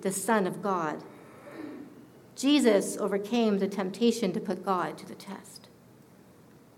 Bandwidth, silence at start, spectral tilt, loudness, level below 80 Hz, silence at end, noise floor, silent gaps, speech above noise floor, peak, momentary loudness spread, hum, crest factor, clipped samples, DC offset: 16.5 kHz; 0 s; -4.5 dB/octave; -28 LUFS; -76 dBFS; 1.1 s; -55 dBFS; none; 27 dB; -10 dBFS; 23 LU; none; 20 dB; under 0.1%; under 0.1%